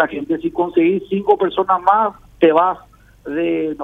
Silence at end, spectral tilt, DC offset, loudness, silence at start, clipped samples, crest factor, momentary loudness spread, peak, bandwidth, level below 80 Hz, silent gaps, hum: 0 s; -8 dB/octave; under 0.1%; -17 LUFS; 0 s; under 0.1%; 16 dB; 8 LU; 0 dBFS; 3.9 kHz; -52 dBFS; none; none